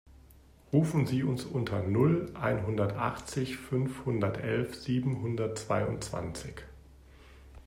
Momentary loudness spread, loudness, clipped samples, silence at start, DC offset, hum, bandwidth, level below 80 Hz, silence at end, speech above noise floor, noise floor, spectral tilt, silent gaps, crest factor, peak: 9 LU; -31 LUFS; under 0.1%; 0.1 s; under 0.1%; none; 16 kHz; -54 dBFS; 0.05 s; 27 dB; -57 dBFS; -7 dB/octave; none; 18 dB; -14 dBFS